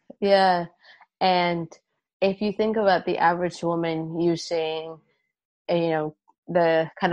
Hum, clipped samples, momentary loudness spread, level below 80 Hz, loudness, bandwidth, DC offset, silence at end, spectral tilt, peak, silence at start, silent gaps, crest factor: none; under 0.1%; 11 LU; -66 dBFS; -24 LUFS; 9.8 kHz; under 0.1%; 0 s; -6 dB/octave; -6 dBFS; 0.2 s; 2.13-2.20 s, 5.45-5.65 s, 6.38-6.43 s; 18 dB